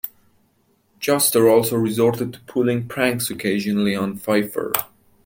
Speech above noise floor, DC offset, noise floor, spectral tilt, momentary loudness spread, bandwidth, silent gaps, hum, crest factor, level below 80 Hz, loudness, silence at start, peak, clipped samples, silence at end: 43 dB; under 0.1%; -63 dBFS; -4.5 dB/octave; 10 LU; 17 kHz; none; none; 20 dB; -60 dBFS; -20 LUFS; 0.05 s; -2 dBFS; under 0.1%; 0.4 s